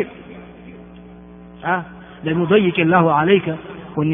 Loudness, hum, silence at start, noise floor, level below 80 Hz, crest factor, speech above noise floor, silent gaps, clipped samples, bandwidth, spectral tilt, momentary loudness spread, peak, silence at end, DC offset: -18 LUFS; none; 0 s; -40 dBFS; -52 dBFS; 18 dB; 24 dB; none; under 0.1%; 3.8 kHz; -5 dB/octave; 24 LU; 0 dBFS; 0 s; under 0.1%